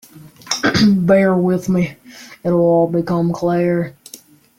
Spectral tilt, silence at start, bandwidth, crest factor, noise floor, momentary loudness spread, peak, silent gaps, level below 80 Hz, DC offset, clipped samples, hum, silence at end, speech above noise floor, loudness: -6 dB/octave; 0.2 s; 15.5 kHz; 14 dB; -42 dBFS; 10 LU; -2 dBFS; none; -50 dBFS; under 0.1%; under 0.1%; none; 0.4 s; 28 dB; -16 LUFS